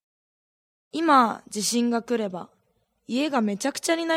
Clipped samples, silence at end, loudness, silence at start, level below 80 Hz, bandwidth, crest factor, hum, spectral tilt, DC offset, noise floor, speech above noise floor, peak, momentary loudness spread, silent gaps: under 0.1%; 0 s; -24 LUFS; 0.95 s; -74 dBFS; 16 kHz; 20 dB; none; -3.5 dB/octave; under 0.1%; -70 dBFS; 47 dB; -6 dBFS; 12 LU; none